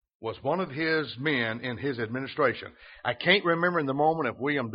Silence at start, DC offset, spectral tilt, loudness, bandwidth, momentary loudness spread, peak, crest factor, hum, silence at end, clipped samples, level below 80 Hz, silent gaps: 0.2 s; under 0.1%; -3 dB/octave; -27 LUFS; 5.4 kHz; 10 LU; -6 dBFS; 22 dB; none; 0 s; under 0.1%; -66 dBFS; none